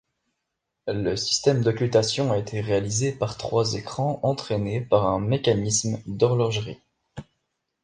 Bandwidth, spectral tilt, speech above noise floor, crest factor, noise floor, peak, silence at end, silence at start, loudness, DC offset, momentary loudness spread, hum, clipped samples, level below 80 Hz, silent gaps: 10 kHz; -5 dB/octave; 57 dB; 20 dB; -81 dBFS; -4 dBFS; 0.6 s; 0.85 s; -24 LUFS; under 0.1%; 12 LU; none; under 0.1%; -52 dBFS; none